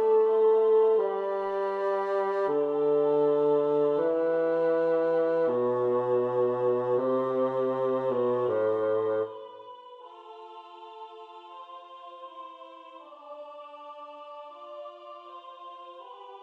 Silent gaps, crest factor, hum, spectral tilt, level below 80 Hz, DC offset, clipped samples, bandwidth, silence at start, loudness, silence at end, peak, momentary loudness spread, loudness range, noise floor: none; 12 dB; none; -8 dB/octave; -76 dBFS; under 0.1%; under 0.1%; 4.6 kHz; 0 s; -26 LUFS; 0 s; -16 dBFS; 22 LU; 20 LU; -48 dBFS